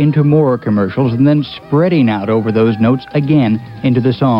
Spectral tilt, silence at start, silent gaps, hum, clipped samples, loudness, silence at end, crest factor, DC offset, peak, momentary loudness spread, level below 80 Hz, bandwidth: -10 dB/octave; 0 s; none; none; under 0.1%; -13 LUFS; 0 s; 10 dB; under 0.1%; -2 dBFS; 5 LU; -48 dBFS; 5.6 kHz